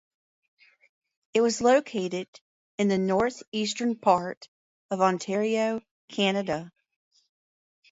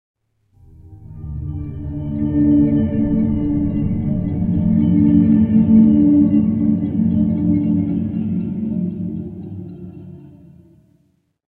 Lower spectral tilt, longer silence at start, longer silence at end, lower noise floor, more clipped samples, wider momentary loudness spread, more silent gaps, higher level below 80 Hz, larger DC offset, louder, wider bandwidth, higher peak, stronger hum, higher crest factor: second, -4.5 dB/octave vs -13 dB/octave; first, 1.35 s vs 0.85 s; about the same, 1.25 s vs 1.25 s; first, under -90 dBFS vs -62 dBFS; neither; second, 13 LU vs 18 LU; first, 2.28-2.33 s, 2.41-2.78 s, 3.48-3.52 s, 4.37-4.41 s, 4.48-4.89 s, 5.91-6.08 s vs none; second, -66 dBFS vs -38 dBFS; neither; second, -26 LUFS vs -17 LUFS; first, 8 kHz vs 3.2 kHz; second, -6 dBFS vs -2 dBFS; neither; first, 22 dB vs 14 dB